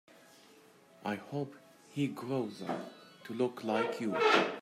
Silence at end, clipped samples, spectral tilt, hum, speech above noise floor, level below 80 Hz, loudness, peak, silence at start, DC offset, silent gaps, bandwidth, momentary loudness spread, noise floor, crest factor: 0 s; under 0.1%; -5.5 dB/octave; none; 27 dB; -84 dBFS; -34 LUFS; -12 dBFS; 1 s; under 0.1%; none; 15 kHz; 17 LU; -61 dBFS; 24 dB